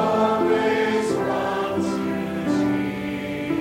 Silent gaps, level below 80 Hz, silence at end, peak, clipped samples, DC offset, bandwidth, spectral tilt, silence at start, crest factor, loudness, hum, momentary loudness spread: none; -54 dBFS; 0 s; -8 dBFS; under 0.1%; under 0.1%; 16.5 kHz; -6 dB/octave; 0 s; 14 dB; -23 LUFS; none; 7 LU